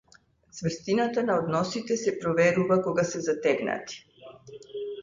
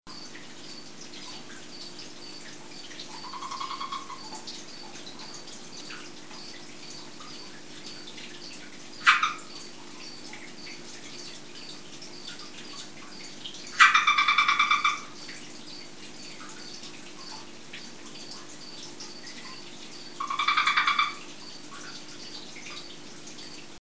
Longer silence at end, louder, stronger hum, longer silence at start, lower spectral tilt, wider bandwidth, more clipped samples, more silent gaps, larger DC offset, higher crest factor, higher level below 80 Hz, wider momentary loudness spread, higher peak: about the same, 0 s vs 0 s; about the same, -27 LUFS vs -26 LUFS; neither; first, 0.55 s vs 0 s; first, -5.5 dB/octave vs -0.5 dB/octave; about the same, 7.6 kHz vs 8 kHz; neither; neither; second, under 0.1% vs 0.6%; second, 18 dB vs 30 dB; first, -64 dBFS vs -70 dBFS; second, 18 LU vs 21 LU; second, -10 dBFS vs -2 dBFS